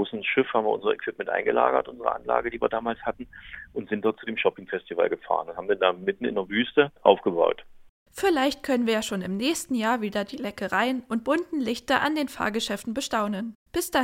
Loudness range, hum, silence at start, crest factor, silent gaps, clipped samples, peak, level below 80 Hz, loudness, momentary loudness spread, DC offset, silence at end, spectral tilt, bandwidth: 4 LU; none; 0 s; 24 dB; 7.89-8.06 s, 13.55-13.66 s; under 0.1%; -2 dBFS; -58 dBFS; -26 LUFS; 9 LU; under 0.1%; 0 s; -4 dB/octave; 16.5 kHz